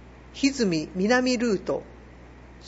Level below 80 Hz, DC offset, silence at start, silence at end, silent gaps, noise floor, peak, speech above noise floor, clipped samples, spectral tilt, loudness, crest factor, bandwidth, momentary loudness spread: -50 dBFS; under 0.1%; 0 s; 0 s; none; -46 dBFS; -8 dBFS; 22 dB; under 0.1%; -4.5 dB/octave; -25 LUFS; 18 dB; 8 kHz; 10 LU